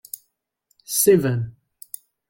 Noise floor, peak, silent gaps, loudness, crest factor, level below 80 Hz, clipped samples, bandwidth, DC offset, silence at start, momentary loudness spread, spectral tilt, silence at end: -72 dBFS; -4 dBFS; none; -19 LUFS; 18 dB; -60 dBFS; under 0.1%; 17 kHz; under 0.1%; 0.9 s; 21 LU; -5 dB/octave; 0.8 s